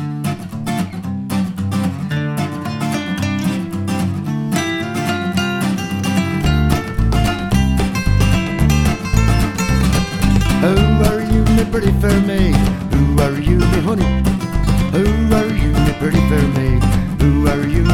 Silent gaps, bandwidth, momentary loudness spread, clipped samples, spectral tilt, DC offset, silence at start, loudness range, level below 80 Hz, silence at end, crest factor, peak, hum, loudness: none; 17.5 kHz; 7 LU; under 0.1%; -6.5 dB/octave; under 0.1%; 0 s; 5 LU; -22 dBFS; 0 s; 14 dB; 0 dBFS; none; -16 LUFS